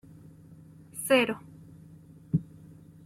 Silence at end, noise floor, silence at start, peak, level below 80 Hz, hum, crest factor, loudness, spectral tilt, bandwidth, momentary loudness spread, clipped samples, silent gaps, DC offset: 0.65 s; -52 dBFS; 0.5 s; -10 dBFS; -62 dBFS; none; 22 dB; -28 LUFS; -5 dB/octave; 16 kHz; 27 LU; under 0.1%; none; under 0.1%